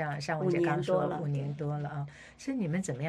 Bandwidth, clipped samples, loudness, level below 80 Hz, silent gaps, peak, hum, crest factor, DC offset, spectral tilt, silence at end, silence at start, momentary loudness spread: 10.5 kHz; under 0.1%; -32 LUFS; -64 dBFS; none; -14 dBFS; none; 18 dB; under 0.1%; -7 dB/octave; 0 s; 0 s; 10 LU